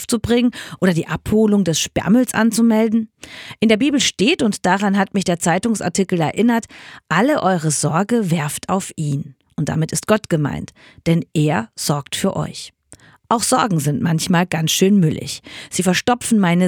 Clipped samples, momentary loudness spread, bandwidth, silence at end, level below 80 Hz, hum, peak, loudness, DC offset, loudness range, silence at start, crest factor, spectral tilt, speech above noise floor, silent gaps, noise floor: under 0.1%; 11 LU; 18.5 kHz; 0 s; -48 dBFS; none; -2 dBFS; -18 LUFS; under 0.1%; 4 LU; 0 s; 16 dB; -5 dB/octave; 30 dB; none; -47 dBFS